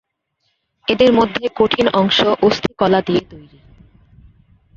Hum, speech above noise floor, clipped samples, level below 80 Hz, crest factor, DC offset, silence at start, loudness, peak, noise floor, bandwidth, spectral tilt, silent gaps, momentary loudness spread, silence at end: none; 54 dB; under 0.1%; -48 dBFS; 16 dB; under 0.1%; 0.9 s; -15 LUFS; -2 dBFS; -69 dBFS; 7.6 kHz; -5.5 dB/octave; none; 8 LU; 1.35 s